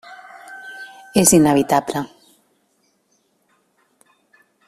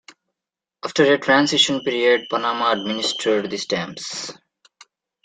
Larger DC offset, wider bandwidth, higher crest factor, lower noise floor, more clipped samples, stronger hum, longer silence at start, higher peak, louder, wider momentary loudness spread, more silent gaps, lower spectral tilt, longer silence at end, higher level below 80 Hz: neither; first, 15.5 kHz vs 9.6 kHz; about the same, 22 dB vs 20 dB; second, -65 dBFS vs -87 dBFS; neither; neither; second, 0.1 s vs 0.85 s; about the same, 0 dBFS vs -2 dBFS; first, -16 LUFS vs -19 LUFS; first, 26 LU vs 13 LU; neither; about the same, -4 dB/octave vs -3 dB/octave; first, 2.6 s vs 0.9 s; first, -54 dBFS vs -66 dBFS